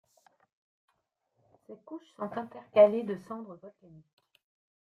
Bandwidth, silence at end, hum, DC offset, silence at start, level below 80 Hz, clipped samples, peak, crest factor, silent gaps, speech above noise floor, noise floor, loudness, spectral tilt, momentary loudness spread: 4.6 kHz; 1.15 s; none; under 0.1%; 1.7 s; -78 dBFS; under 0.1%; -10 dBFS; 22 dB; none; 49 dB; -79 dBFS; -28 LUFS; -7.5 dB/octave; 24 LU